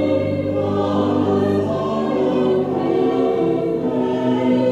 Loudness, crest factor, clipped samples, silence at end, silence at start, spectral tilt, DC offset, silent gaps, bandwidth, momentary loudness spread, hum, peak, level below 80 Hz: -19 LUFS; 12 dB; under 0.1%; 0 s; 0 s; -8.5 dB/octave; under 0.1%; none; 8.4 kHz; 3 LU; none; -6 dBFS; -52 dBFS